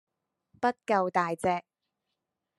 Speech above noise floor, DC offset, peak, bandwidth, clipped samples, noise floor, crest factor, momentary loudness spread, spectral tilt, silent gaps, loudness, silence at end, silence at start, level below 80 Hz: 57 dB; under 0.1%; -10 dBFS; 12.5 kHz; under 0.1%; -85 dBFS; 20 dB; 4 LU; -5.5 dB/octave; none; -29 LUFS; 1 s; 0.6 s; -72 dBFS